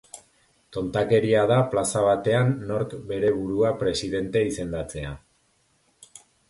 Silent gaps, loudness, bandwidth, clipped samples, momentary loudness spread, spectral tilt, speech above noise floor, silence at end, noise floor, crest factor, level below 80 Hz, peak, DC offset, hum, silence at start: none; -24 LUFS; 11.5 kHz; under 0.1%; 15 LU; -5.5 dB/octave; 43 dB; 1.35 s; -66 dBFS; 16 dB; -50 dBFS; -8 dBFS; under 0.1%; none; 0.15 s